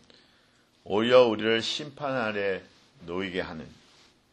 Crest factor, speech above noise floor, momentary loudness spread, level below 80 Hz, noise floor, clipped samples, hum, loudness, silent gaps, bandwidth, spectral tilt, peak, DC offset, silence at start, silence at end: 22 dB; 37 dB; 17 LU; -64 dBFS; -63 dBFS; under 0.1%; none; -26 LUFS; none; 9.2 kHz; -4.5 dB/octave; -6 dBFS; under 0.1%; 0.85 s; 0.65 s